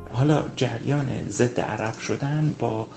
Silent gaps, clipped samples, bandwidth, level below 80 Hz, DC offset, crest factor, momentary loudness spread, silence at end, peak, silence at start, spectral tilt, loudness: none; under 0.1%; 8.8 kHz; -52 dBFS; under 0.1%; 18 dB; 6 LU; 0 s; -6 dBFS; 0 s; -6.5 dB/octave; -25 LUFS